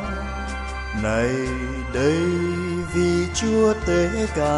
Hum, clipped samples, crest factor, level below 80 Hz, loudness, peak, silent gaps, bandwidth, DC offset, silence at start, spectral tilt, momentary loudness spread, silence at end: none; under 0.1%; 14 dB; -32 dBFS; -22 LUFS; -8 dBFS; none; 11.5 kHz; under 0.1%; 0 s; -5.5 dB/octave; 10 LU; 0 s